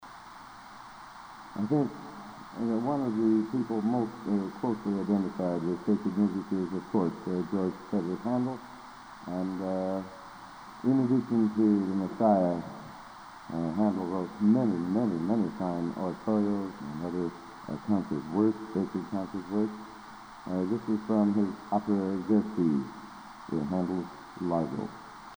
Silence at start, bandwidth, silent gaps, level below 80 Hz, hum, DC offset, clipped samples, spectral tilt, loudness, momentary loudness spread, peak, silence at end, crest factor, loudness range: 0 s; over 20 kHz; none; -64 dBFS; none; under 0.1%; under 0.1%; -8.5 dB/octave; -30 LUFS; 19 LU; -10 dBFS; 0 s; 20 dB; 4 LU